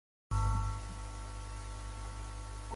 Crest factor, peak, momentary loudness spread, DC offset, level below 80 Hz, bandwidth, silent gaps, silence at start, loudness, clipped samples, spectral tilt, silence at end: 16 dB; -22 dBFS; 11 LU; under 0.1%; -40 dBFS; 11.5 kHz; none; 0.3 s; -40 LUFS; under 0.1%; -5 dB/octave; 0 s